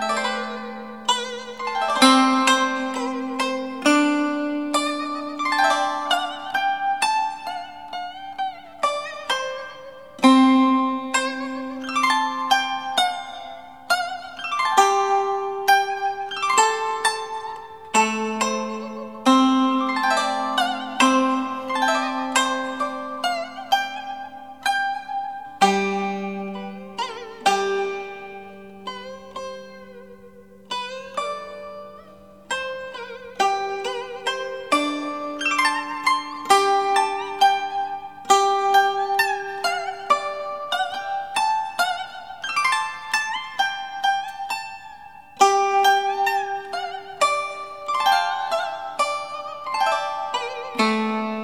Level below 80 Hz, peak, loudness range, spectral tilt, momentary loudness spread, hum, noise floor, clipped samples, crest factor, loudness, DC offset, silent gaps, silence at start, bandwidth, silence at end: -66 dBFS; 0 dBFS; 8 LU; -2.5 dB/octave; 16 LU; none; -46 dBFS; under 0.1%; 22 dB; -22 LUFS; 0.3%; none; 0 s; 15.5 kHz; 0 s